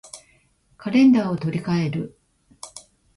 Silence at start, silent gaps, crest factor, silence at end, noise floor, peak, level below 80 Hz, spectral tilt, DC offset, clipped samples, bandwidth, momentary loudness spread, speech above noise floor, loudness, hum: 0.15 s; none; 16 dB; 0.35 s; -60 dBFS; -8 dBFS; -58 dBFS; -7 dB/octave; under 0.1%; under 0.1%; 11.5 kHz; 26 LU; 41 dB; -20 LUFS; none